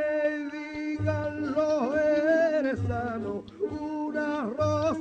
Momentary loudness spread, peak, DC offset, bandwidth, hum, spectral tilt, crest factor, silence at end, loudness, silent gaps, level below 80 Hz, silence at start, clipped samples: 10 LU; -14 dBFS; under 0.1%; 8.4 kHz; none; -7.5 dB/octave; 14 dB; 0 s; -28 LUFS; none; -54 dBFS; 0 s; under 0.1%